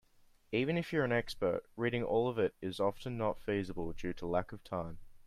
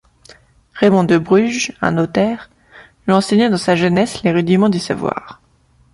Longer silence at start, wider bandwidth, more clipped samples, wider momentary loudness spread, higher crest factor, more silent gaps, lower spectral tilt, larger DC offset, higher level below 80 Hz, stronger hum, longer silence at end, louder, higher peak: second, 0.5 s vs 0.75 s; first, 14.5 kHz vs 11.5 kHz; neither; about the same, 9 LU vs 8 LU; about the same, 18 dB vs 16 dB; neither; about the same, -7 dB/octave vs -6 dB/octave; neither; second, -56 dBFS vs -50 dBFS; neither; second, 0 s vs 0.6 s; second, -36 LUFS vs -15 LUFS; second, -18 dBFS vs 0 dBFS